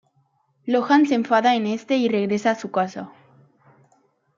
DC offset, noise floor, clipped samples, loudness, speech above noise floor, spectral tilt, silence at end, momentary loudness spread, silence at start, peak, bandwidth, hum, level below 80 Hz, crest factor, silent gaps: under 0.1%; -65 dBFS; under 0.1%; -21 LUFS; 45 dB; -5.5 dB/octave; 1.3 s; 13 LU; 0.65 s; -4 dBFS; 7.6 kHz; none; -74 dBFS; 18 dB; none